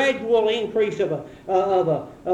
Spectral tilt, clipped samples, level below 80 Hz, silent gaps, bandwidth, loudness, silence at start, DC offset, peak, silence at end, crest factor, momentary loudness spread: -5.5 dB/octave; under 0.1%; -58 dBFS; none; 10 kHz; -22 LUFS; 0 s; under 0.1%; -8 dBFS; 0 s; 14 dB; 6 LU